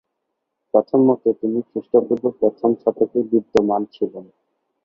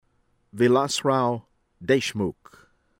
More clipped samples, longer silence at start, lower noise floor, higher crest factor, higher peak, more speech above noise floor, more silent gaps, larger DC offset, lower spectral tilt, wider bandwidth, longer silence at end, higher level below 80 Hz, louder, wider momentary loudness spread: neither; first, 0.75 s vs 0.55 s; first, -77 dBFS vs -67 dBFS; about the same, 18 dB vs 18 dB; first, -2 dBFS vs -8 dBFS; first, 58 dB vs 44 dB; neither; neither; first, -8.5 dB/octave vs -5 dB/octave; second, 7.4 kHz vs 16.5 kHz; about the same, 0.6 s vs 0.7 s; about the same, -60 dBFS vs -60 dBFS; first, -19 LUFS vs -24 LUFS; about the same, 9 LU vs 11 LU